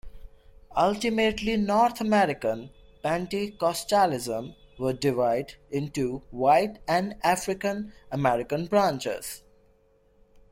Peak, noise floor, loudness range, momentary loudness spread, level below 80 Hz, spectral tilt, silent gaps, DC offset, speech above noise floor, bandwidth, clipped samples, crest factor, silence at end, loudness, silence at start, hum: -10 dBFS; -62 dBFS; 2 LU; 11 LU; -52 dBFS; -5 dB/octave; none; under 0.1%; 37 dB; 16.5 kHz; under 0.1%; 18 dB; 1.15 s; -26 LUFS; 0.05 s; none